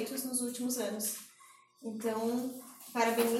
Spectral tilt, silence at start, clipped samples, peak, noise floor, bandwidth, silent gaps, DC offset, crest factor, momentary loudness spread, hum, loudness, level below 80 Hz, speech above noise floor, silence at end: -3 dB/octave; 0 s; under 0.1%; -16 dBFS; -61 dBFS; 16.5 kHz; none; under 0.1%; 18 dB; 13 LU; none; -35 LUFS; -86 dBFS; 27 dB; 0 s